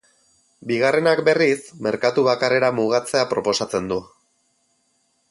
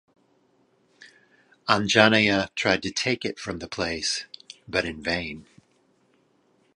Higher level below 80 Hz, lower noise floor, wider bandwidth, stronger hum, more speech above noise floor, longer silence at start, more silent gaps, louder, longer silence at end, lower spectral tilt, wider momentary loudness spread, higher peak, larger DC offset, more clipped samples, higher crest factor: second, -60 dBFS vs -54 dBFS; about the same, -67 dBFS vs -65 dBFS; about the same, 11.5 kHz vs 11.5 kHz; neither; first, 47 dB vs 41 dB; second, 0.65 s vs 1.65 s; neither; first, -20 LUFS vs -24 LUFS; about the same, 1.25 s vs 1.35 s; about the same, -4.5 dB/octave vs -3.5 dB/octave; second, 9 LU vs 17 LU; second, -4 dBFS vs 0 dBFS; neither; neither; second, 18 dB vs 26 dB